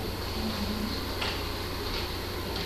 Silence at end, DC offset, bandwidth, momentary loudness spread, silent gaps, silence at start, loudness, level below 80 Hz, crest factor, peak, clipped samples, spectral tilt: 0 s; under 0.1%; 14 kHz; 2 LU; none; 0 s; -32 LUFS; -40 dBFS; 16 dB; -18 dBFS; under 0.1%; -4.5 dB/octave